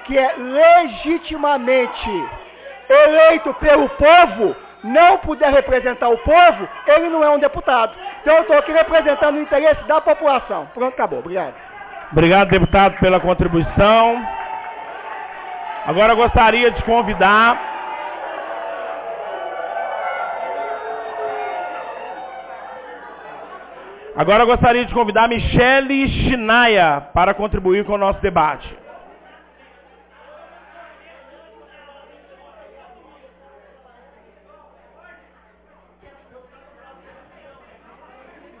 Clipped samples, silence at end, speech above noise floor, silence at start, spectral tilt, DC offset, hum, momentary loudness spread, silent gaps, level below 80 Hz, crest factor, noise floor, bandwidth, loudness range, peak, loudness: under 0.1%; 7.8 s; 38 dB; 0 s; -9 dB/octave; under 0.1%; none; 19 LU; none; -36 dBFS; 16 dB; -52 dBFS; 4 kHz; 13 LU; 0 dBFS; -15 LUFS